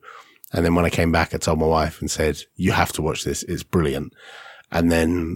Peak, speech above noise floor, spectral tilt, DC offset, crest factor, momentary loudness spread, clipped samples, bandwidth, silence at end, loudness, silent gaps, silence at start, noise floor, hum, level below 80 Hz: 0 dBFS; 23 dB; -5 dB/octave; under 0.1%; 22 dB; 10 LU; under 0.1%; 17 kHz; 0 s; -21 LUFS; none; 0.05 s; -44 dBFS; none; -36 dBFS